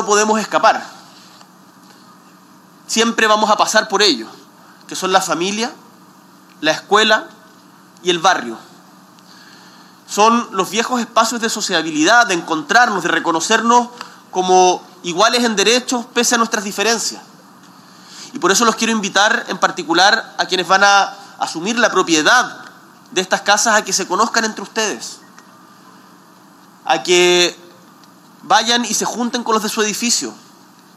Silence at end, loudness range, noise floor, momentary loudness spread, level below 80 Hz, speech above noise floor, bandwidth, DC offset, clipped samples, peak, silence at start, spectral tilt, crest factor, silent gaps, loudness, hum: 0.6 s; 4 LU; -45 dBFS; 11 LU; -74 dBFS; 30 dB; 16 kHz; under 0.1%; under 0.1%; 0 dBFS; 0 s; -2 dB/octave; 18 dB; none; -15 LUFS; none